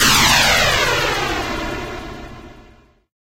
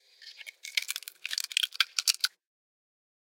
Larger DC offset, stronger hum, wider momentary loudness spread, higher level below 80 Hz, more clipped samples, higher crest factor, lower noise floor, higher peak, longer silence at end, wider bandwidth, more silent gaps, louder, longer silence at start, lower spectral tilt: neither; neither; first, 22 LU vs 18 LU; first, -34 dBFS vs under -90 dBFS; neither; second, 16 dB vs 32 dB; about the same, -49 dBFS vs -49 dBFS; about the same, -2 dBFS vs -2 dBFS; second, 0.6 s vs 1.1 s; about the same, 17 kHz vs 17 kHz; neither; first, -15 LUFS vs -29 LUFS; second, 0 s vs 0.2 s; first, -2 dB/octave vs 7 dB/octave